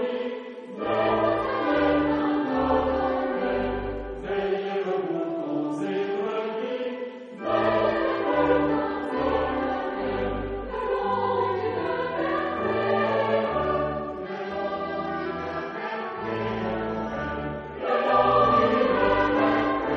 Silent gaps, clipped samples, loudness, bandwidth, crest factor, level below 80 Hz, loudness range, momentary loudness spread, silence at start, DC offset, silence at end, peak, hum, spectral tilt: none; under 0.1%; -26 LUFS; 7.2 kHz; 18 dB; -46 dBFS; 5 LU; 10 LU; 0 s; under 0.1%; 0 s; -8 dBFS; none; -7.5 dB/octave